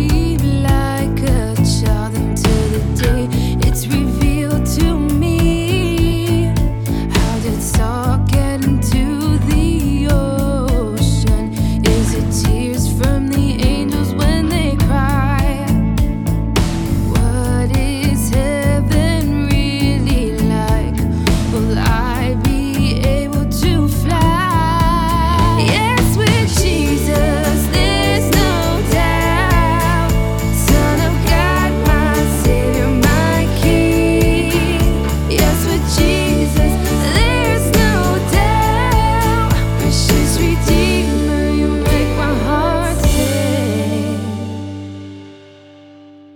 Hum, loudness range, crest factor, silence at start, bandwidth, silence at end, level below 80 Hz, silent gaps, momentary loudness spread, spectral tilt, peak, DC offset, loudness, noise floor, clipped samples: none; 2 LU; 14 dB; 0 s; 20 kHz; 1 s; -20 dBFS; none; 4 LU; -5.5 dB/octave; 0 dBFS; under 0.1%; -15 LUFS; -40 dBFS; under 0.1%